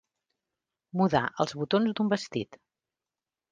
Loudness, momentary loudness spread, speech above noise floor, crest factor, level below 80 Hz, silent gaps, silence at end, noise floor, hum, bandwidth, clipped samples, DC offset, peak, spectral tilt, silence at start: -28 LUFS; 10 LU; over 62 dB; 22 dB; -64 dBFS; none; 0.95 s; under -90 dBFS; none; 9.4 kHz; under 0.1%; under 0.1%; -8 dBFS; -6 dB/octave; 0.95 s